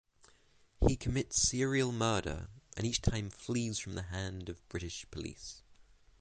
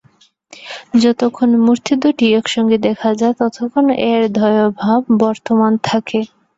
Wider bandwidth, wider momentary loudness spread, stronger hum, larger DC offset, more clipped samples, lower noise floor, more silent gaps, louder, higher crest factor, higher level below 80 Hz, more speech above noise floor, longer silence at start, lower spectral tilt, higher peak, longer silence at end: first, 9.6 kHz vs 8 kHz; first, 15 LU vs 5 LU; neither; neither; neither; first, -66 dBFS vs -53 dBFS; neither; second, -35 LUFS vs -14 LUFS; first, 24 dB vs 12 dB; first, -44 dBFS vs -56 dBFS; second, 31 dB vs 39 dB; first, 0.8 s vs 0.6 s; second, -4 dB/octave vs -5.5 dB/octave; second, -14 dBFS vs -2 dBFS; about the same, 0.4 s vs 0.3 s